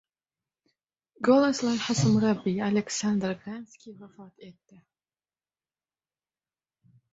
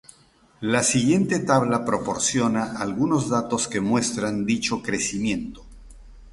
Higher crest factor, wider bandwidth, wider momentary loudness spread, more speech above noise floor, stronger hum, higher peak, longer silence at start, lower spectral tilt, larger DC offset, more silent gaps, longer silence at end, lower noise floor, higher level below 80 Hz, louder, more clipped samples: about the same, 20 dB vs 20 dB; second, 8 kHz vs 11.5 kHz; first, 20 LU vs 6 LU; first, over 63 dB vs 34 dB; neither; second, -8 dBFS vs -4 dBFS; first, 1.2 s vs 0.6 s; first, -5.5 dB/octave vs -4 dB/octave; neither; neither; first, 2.6 s vs 0 s; first, under -90 dBFS vs -56 dBFS; second, -66 dBFS vs -50 dBFS; second, -26 LUFS vs -23 LUFS; neither